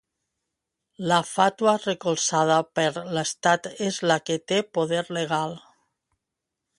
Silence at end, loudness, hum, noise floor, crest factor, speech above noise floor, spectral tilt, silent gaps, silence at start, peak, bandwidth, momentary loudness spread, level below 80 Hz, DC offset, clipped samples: 1.2 s; -24 LUFS; none; -84 dBFS; 22 dB; 60 dB; -3.5 dB/octave; none; 1 s; -4 dBFS; 11.5 kHz; 7 LU; -70 dBFS; under 0.1%; under 0.1%